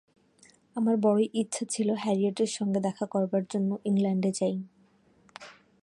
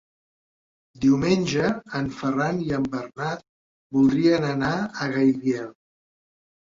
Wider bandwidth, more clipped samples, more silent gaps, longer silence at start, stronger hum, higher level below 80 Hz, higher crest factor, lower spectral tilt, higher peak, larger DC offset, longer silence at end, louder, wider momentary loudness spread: first, 11.5 kHz vs 7.6 kHz; neither; second, none vs 3.49-3.90 s; second, 0.75 s vs 1 s; neither; second, -76 dBFS vs -56 dBFS; about the same, 16 dB vs 16 dB; about the same, -6 dB/octave vs -6.5 dB/octave; second, -12 dBFS vs -8 dBFS; neither; second, 0.3 s vs 1 s; second, -28 LUFS vs -23 LUFS; first, 14 LU vs 10 LU